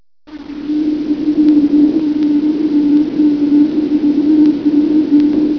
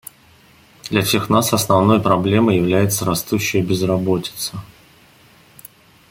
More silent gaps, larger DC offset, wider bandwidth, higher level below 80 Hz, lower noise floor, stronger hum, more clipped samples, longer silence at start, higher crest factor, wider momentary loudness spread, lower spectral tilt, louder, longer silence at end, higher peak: neither; neither; second, 5.4 kHz vs 17 kHz; about the same, -46 dBFS vs -50 dBFS; second, -33 dBFS vs -50 dBFS; neither; neither; second, 0.3 s vs 0.85 s; second, 10 dB vs 16 dB; second, 6 LU vs 11 LU; first, -8.5 dB/octave vs -5 dB/octave; first, -12 LUFS vs -17 LUFS; second, 0 s vs 1.45 s; about the same, -2 dBFS vs -2 dBFS